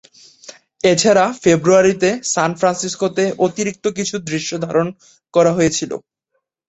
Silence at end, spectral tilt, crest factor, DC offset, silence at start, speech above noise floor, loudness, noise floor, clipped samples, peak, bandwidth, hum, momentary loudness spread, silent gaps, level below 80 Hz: 0.7 s; -4 dB/octave; 16 dB; under 0.1%; 0.5 s; 55 dB; -16 LUFS; -72 dBFS; under 0.1%; -2 dBFS; 8.4 kHz; none; 10 LU; none; -54 dBFS